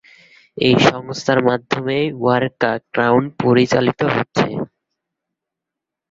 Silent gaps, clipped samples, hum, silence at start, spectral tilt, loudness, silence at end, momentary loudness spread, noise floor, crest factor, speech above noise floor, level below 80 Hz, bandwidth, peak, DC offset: none; under 0.1%; none; 0.55 s; -6 dB/octave; -17 LUFS; 1.45 s; 7 LU; -84 dBFS; 18 dB; 67 dB; -52 dBFS; 7.8 kHz; 0 dBFS; under 0.1%